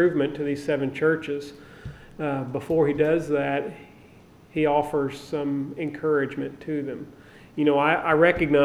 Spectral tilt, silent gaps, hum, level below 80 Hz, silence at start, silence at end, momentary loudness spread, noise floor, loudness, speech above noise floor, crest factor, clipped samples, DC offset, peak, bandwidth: -7 dB/octave; none; none; -54 dBFS; 0 s; 0 s; 18 LU; -51 dBFS; -25 LUFS; 27 dB; 20 dB; under 0.1%; under 0.1%; -6 dBFS; 12.5 kHz